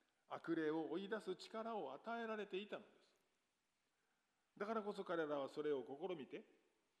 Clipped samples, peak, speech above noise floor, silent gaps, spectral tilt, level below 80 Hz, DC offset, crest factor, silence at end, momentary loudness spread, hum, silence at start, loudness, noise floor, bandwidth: under 0.1%; -30 dBFS; 41 dB; none; -6 dB/octave; under -90 dBFS; under 0.1%; 18 dB; 0.55 s; 9 LU; none; 0.3 s; -47 LUFS; -88 dBFS; 11.5 kHz